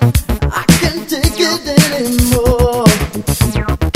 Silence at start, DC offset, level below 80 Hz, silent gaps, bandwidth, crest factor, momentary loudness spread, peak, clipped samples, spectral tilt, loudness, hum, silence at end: 0 s; under 0.1%; -20 dBFS; none; 16.5 kHz; 12 dB; 5 LU; 0 dBFS; 0.4%; -5 dB/octave; -13 LUFS; none; 0.05 s